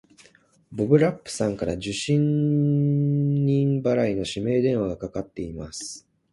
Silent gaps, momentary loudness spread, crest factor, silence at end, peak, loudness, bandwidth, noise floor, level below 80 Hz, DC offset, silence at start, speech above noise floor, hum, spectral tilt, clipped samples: none; 13 LU; 18 dB; 0.35 s; -4 dBFS; -24 LUFS; 11.5 kHz; -58 dBFS; -52 dBFS; under 0.1%; 0.7 s; 35 dB; none; -7 dB/octave; under 0.1%